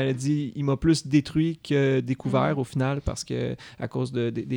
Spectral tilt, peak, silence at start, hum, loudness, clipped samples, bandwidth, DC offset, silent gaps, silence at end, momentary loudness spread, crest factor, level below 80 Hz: -6.5 dB/octave; -10 dBFS; 0 s; none; -26 LUFS; under 0.1%; 17 kHz; under 0.1%; none; 0 s; 8 LU; 16 dB; -46 dBFS